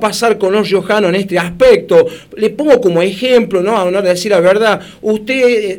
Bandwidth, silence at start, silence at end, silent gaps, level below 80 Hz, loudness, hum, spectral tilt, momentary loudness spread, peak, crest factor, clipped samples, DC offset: 17 kHz; 0 s; 0 s; none; -44 dBFS; -12 LUFS; none; -5 dB/octave; 8 LU; 0 dBFS; 12 dB; 0.4%; 0.1%